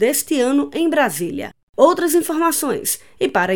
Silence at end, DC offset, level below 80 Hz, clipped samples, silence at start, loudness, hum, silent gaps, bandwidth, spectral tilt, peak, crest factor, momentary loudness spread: 0 s; 0.5%; -60 dBFS; under 0.1%; 0 s; -18 LUFS; none; 1.63-1.73 s; over 20 kHz; -3.5 dB/octave; 0 dBFS; 18 dB; 9 LU